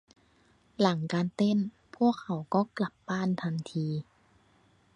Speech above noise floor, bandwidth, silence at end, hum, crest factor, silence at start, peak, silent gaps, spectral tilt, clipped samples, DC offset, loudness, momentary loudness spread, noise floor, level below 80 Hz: 36 dB; 10 kHz; 0.95 s; none; 22 dB; 0.8 s; -10 dBFS; none; -7 dB/octave; under 0.1%; under 0.1%; -30 LUFS; 7 LU; -65 dBFS; -70 dBFS